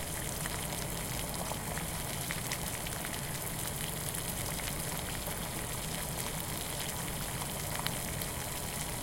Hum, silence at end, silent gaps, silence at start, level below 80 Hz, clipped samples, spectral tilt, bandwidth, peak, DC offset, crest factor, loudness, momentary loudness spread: none; 0 s; none; 0 s; -48 dBFS; under 0.1%; -3 dB/octave; 17 kHz; -10 dBFS; under 0.1%; 26 dB; -36 LUFS; 1 LU